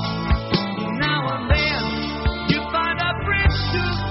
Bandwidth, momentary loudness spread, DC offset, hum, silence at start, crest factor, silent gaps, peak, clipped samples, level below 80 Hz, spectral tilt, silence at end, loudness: 6 kHz; 5 LU; under 0.1%; none; 0 s; 16 dB; none; -4 dBFS; under 0.1%; -28 dBFS; -3.5 dB/octave; 0 s; -21 LUFS